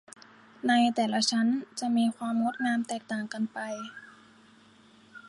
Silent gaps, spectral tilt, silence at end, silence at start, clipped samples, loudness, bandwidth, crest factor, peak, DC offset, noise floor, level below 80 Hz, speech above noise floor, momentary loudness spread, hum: none; -3.5 dB/octave; 0 s; 0.65 s; under 0.1%; -28 LUFS; 11.5 kHz; 18 dB; -12 dBFS; under 0.1%; -58 dBFS; -80 dBFS; 30 dB; 12 LU; none